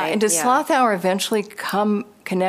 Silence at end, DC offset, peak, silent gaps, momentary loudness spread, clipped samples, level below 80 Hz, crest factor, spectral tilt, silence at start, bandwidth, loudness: 0 s; under 0.1%; -6 dBFS; none; 8 LU; under 0.1%; -72 dBFS; 14 dB; -3.5 dB/octave; 0 s; 15.5 kHz; -20 LUFS